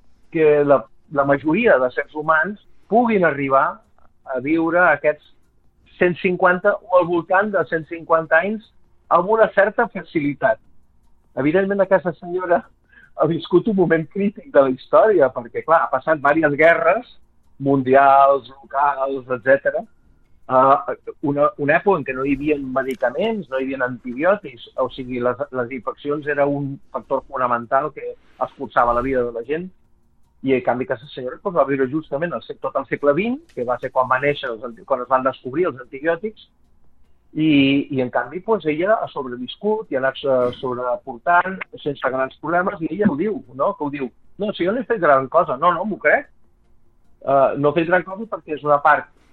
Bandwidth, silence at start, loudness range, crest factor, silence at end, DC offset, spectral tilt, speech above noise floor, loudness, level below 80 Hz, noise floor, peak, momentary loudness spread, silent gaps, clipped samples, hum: 4.5 kHz; 0.3 s; 6 LU; 16 dB; 0.3 s; under 0.1%; -8.5 dB/octave; 36 dB; -19 LUFS; -52 dBFS; -55 dBFS; -2 dBFS; 12 LU; none; under 0.1%; none